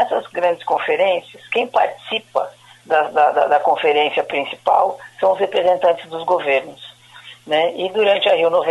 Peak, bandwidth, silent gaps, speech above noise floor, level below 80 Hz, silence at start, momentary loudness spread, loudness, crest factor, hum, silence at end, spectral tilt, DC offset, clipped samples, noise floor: -2 dBFS; 12 kHz; none; 25 dB; -66 dBFS; 0 s; 9 LU; -18 LUFS; 16 dB; none; 0 s; -4 dB/octave; under 0.1%; under 0.1%; -42 dBFS